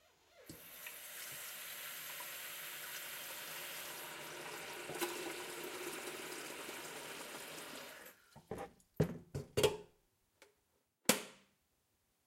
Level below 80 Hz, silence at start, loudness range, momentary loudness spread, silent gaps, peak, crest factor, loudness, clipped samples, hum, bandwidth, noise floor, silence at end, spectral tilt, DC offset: -70 dBFS; 0.3 s; 6 LU; 16 LU; none; -12 dBFS; 32 dB; -43 LUFS; under 0.1%; none; 16 kHz; -80 dBFS; 0.8 s; -3 dB/octave; under 0.1%